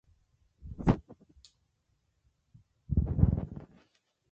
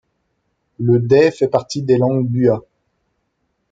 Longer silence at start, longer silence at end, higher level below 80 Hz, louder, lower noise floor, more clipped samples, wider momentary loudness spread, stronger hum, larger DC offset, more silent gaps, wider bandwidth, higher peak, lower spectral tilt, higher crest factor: second, 0.65 s vs 0.8 s; second, 0.65 s vs 1.1 s; first, -40 dBFS vs -56 dBFS; second, -31 LUFS vs -16 LUFS; first, -76 dBFS vs -69 dBFS; neither; first, 18 LU vs 7 LU; neither; neither; neither; about the same, 7.6 kHz vs 7.8 kHz; second, -10 dBFS vs 0 dBFS; first, -10 dB/octave vs -7.5 dB/octave; first, 24 dB vs 18 dB